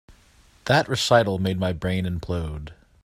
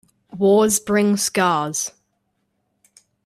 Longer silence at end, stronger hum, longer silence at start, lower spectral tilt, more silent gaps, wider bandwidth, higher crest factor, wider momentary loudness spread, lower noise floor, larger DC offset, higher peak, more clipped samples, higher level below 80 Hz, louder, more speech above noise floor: second, 0.3 s vs 1.35 s; neither; first, 0.65 s vs 0.35 s; about the same, -5 dB/octave vs -4 dB/octave; neither; about the same, 15.5 kHz vs 15.5 kHz; about the same, 20 dB vs 16 dB; first, 16 LU vs 9 LU; second, -55 dBFS vs -71 dBFS; neither; about the same, -4 dBFS vs -4 dBFS; neither; first, -44 dBFS vs -60 dBFS; second, -23 LUFS vs -18 LUFS; second, 33 dB vs 53 dB